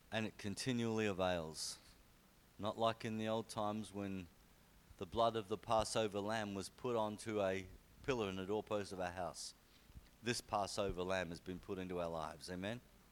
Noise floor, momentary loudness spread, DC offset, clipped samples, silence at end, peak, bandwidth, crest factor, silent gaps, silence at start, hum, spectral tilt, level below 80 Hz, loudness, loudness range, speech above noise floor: -68 dBFS; 9 LU; under 0.1%; under 0.1%; 0.15 s; -22 dBFS; 19 kHz; 22 dB; none; 0.1 s; none; -4.5 dB/octave; -64 dBFS; -42 LUFS; 3 LU; 26 dB